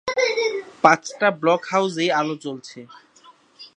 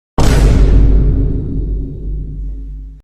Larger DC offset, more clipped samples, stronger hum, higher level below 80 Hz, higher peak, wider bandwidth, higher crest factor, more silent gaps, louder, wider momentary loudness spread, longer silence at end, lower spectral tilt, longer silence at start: neither; neither; neither; second, -68 dBFS vs -12 dBFS; about the same, 0 dBFS vs 0 dBFS; about the same, 10.5 kHz vs 11 kHz; first, 22 dB vs 12 dB; neither; second, -20 LUFS vs -15 LUFS; about the same, 17 LU vs 16 LU; about the same, 0.1 s vs 0.05 s; second, -4 dB/octave vs -7 dB/octave; second, 0.05 s vs 0.2 s